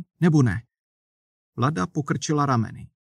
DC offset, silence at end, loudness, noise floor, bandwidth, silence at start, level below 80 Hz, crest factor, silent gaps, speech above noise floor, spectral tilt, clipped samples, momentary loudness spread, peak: under 0.1%; 0.2 s; -24 LUFS; under -90 dBFS; 10.5 kHz; 0 s; -56 dBFS; 16 dB; 0.79-1.53 s; over 68 dB; -6.5 dB/octave; under 0.1%; 13 LU; -8 dBFS